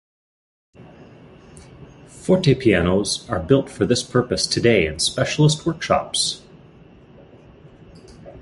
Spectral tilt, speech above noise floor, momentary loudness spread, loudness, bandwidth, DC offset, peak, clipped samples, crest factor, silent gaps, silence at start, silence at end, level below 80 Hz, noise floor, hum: -4.5 dB/octave; 28 dB; 6 LU; -19 LUFS; 11.5 kHz; under 0.1%; -2 dBFS; under 0.1%; 20 dB; none; 0.8 s; 0 s; -44 dBFS; -47 dBFS; none